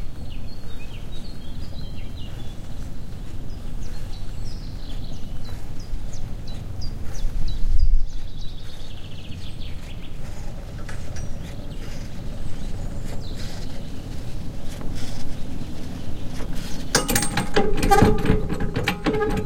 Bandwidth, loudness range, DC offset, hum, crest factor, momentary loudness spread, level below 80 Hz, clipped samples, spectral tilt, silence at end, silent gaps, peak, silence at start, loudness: 16 kHz; 14 LU; under 0.1%; none; 18 dB; 15 LU; -26 dBFS; under 0.1%; -4.5 dB/octave; 0 s; none; -2 dBFS; 0 s; -29 LUFS